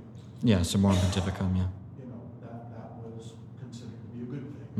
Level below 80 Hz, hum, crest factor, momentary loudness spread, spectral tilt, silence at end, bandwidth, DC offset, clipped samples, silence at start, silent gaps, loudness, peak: -52 dBFS; none; 20 dB; 19 LU; -6 dB/octave; 0 s; 13.5 kHz; under 0.1%; under 0.1%; 0 s; none; -28 LUFS; -10 dBFS